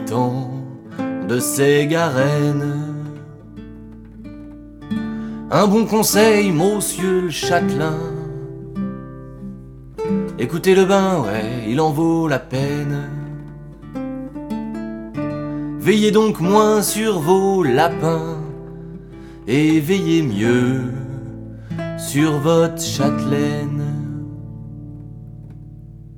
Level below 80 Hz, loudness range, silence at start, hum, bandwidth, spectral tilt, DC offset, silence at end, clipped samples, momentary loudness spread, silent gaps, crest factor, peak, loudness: -44 dBFS; 7 LU; 0 s; none; 19 kHz; -5.5 dB/octave; under 0.1%; 0 s; under 0.1%; 22 LU; none; 18 dB; -2 dBFS; -18 LUFS